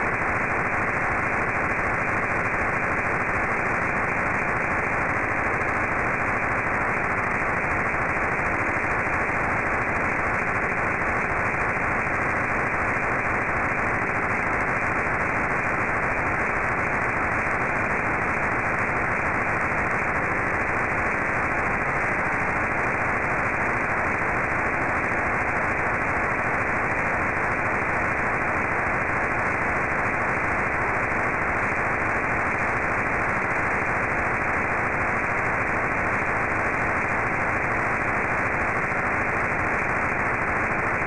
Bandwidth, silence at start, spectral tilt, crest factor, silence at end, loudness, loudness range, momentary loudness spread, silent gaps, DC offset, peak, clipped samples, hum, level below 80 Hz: 12 kHz; 0 s; -6.5 dB/octave; 10 dB; 0 s; -23 LUFS; 0 LU; 0 LU; none; 0.7%; -14 dBFS; under 0.1%; none; -42 dBFS